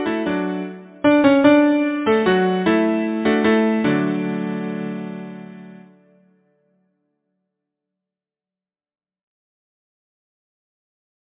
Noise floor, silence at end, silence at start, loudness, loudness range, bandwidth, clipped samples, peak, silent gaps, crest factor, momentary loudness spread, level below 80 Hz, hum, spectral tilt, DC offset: under -90 dBFS; 5.55 s; 0 s; -18 LUFS; 16 LU; 4 kHz; under 0.1%; -2 dBFS; none; 20 dB; 17 LU; -58 dBFS; none; -10.5 dB/octave; under 0.1%